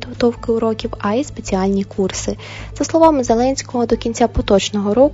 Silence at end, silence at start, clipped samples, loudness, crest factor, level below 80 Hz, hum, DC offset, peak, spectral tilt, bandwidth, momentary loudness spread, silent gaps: 0 s; 0 s; under 0.1%; -17 LUFS; 16 dB; -34 dBFS; none; under 0.1%; 0 dBFS; -5 dB/octave; 8 kHz; 9 LU; none